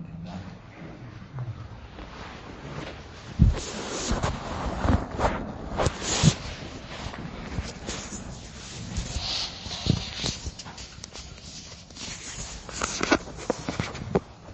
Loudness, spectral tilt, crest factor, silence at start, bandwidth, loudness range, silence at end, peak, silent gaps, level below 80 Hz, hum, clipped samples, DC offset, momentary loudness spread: -30 LUFS; -4.5 dB/octave; 28 dB; 0 s; 8.8 kHz; 6 LU; 0 s; -2 dBFS; none; -38 dBFS; none; under 0.1%; under 0.1%; 17 LU